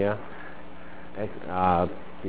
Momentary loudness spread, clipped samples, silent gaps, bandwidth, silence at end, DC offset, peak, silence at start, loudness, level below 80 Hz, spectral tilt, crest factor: 21 LU; under 0.1%; none; 4 kHz; 0 s; 2%; -8 dBFS; 0 s; -28 LUFS; -48 dBFS; -10.5 dB/octave; 22 dB